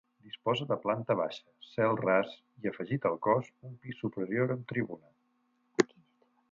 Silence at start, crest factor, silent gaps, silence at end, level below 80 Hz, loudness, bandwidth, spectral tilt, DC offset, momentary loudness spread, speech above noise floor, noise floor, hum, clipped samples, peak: 0.25 s; 26 dB; none; 0.65 s; -74 dBFS; -32 LUFS; 7.8 kHz; -6 dB/octave; under 0.1%; 15 LU; 42 dB; -74 dBFS; none; under 0.1%; -8 dBFS